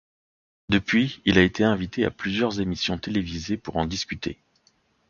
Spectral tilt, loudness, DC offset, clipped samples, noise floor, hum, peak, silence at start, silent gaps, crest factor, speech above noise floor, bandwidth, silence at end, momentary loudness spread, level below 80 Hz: -5.5 dB/octave; -24 LUFS; under 0.1%; under 0.1%; -65 dBFS; none; -2 dBFS; 0.7 s; none; 22 dB; 41 dB; 7.2 kHz; 0.75 s; 11 LU; -46 dBFS